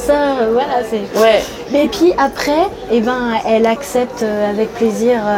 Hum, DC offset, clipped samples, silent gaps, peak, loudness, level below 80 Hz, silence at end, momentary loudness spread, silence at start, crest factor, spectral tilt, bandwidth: none; under 0.1%; under 0.1%; none; 0 dBFS; -15 LUFS; -42 dBFS; 0 s; 5 LU; 0 s; 14 dB; -4.5 dB/octave; 17 kHz